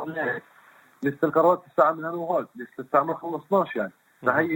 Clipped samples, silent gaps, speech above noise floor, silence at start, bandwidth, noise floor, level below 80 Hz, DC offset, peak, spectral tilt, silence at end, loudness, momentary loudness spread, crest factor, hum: under 0.1%; none; 31 dB; 0 s; 17 kHz; -55 dBFS; -72 dBFS; under 0.1%; -6 dBFS; -8 dB/octave; 0 s; -25 LUFS; 11 LU; 20 dB; none